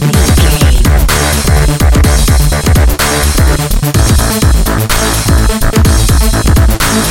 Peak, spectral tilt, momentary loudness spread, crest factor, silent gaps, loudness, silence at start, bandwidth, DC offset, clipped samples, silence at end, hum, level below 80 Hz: 0 dBFS; -4.5 dB/octave; 2 LU; 8 dB; none; -9 LUFS; 0 s; 17.5 kHz; under 0.1%; 0.2%; 0 s; none; -10 dBFS